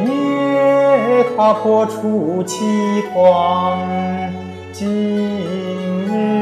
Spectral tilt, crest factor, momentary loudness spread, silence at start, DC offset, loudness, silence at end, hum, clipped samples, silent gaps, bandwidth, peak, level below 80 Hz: -6.5 dB/octave; 14 dB; 9 LU; 0 s; under 0.1%; -16 LUFS; 0 s; none; under 0.1%; none; 13.5 kHz; 0 dBFS; -60 dBFS